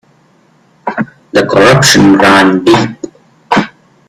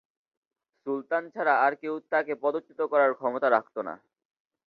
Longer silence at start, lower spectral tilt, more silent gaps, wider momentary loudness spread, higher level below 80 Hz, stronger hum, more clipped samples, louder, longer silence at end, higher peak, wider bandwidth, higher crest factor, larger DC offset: about the same, 0.85 s vs 0.85 s; second, -4.5 dB/octave vs -7.5 dB/octave; neither; first, 18 LU vs 12 LU; first, -42 dBFS vs -82 dBFS; neither; first, 0.3% vs under 0.1%; first, -7 LUFS vs -27 LUFS; second, 0.4 s vs 0.7 s; first, 0 dBFS vs -8 dBFS; first, 17.5 kHz vs 5.4 kHz; second, 10 dB vs 20 dB; neither